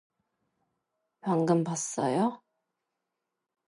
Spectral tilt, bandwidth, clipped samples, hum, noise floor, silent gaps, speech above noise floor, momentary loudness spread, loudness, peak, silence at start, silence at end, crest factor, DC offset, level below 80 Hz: -6 dB/octave; 11.5 kHz; under 0.1%; none; -86 dBFS; none; 58 dB; 6 LU; -29 LUFS; -14 dBFS; 1.25 s; 1.35 s; 20 dB; under 0.1%; -80 dBFS